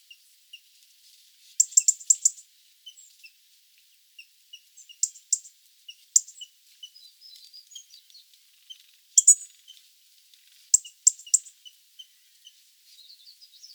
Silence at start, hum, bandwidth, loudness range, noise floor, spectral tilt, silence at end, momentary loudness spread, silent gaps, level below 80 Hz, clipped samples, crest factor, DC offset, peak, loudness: 1.6 s; none; over 20 kHz; 9 LU; -61 dBFS; 12.5 dB/octave; 2.35 s; 28 LU; none; under -90 dBFS; under 0.1%; 28 dB; under 0.1%; -2 dBFS; -21 LUFS